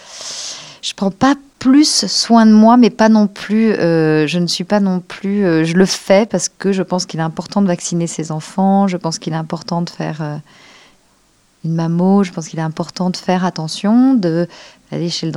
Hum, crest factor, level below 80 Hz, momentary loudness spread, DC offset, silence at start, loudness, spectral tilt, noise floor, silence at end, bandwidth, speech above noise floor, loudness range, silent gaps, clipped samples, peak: none; 14 dB; -56 dBFS; 13 LU; under 0.1%; 0.1 s; -15 LUFS; -5 dB/octave; -55 dBFS; 0 s; 12 kHz; 41 dB; 9 LU; none; under 0.1%; 0 dBFS